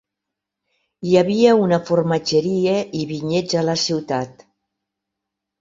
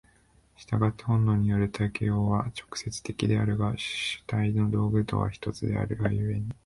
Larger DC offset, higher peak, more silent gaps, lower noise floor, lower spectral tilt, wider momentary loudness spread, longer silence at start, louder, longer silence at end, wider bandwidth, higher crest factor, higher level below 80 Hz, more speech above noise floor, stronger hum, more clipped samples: neither; first, -2 dBFS vs -10 dBFS; neither; first, -83 dBFS vs -62 dBFS; about the same, -5.5 dB/octave vs -6.5 dB/octave; first, 11 LU vs 7 LU; first, 1 s vs 0.6 s; first, -18 LUFS vs -28 LUFS; first, 1.3 s vs 0.15 s; second, 7.8 kHz vs 11.5 kHz; about the same, 18 dB vs 16 dB; second, -60 dBFS vs -48 dBFS; first, 65 dB vs 35 dB; neither; neither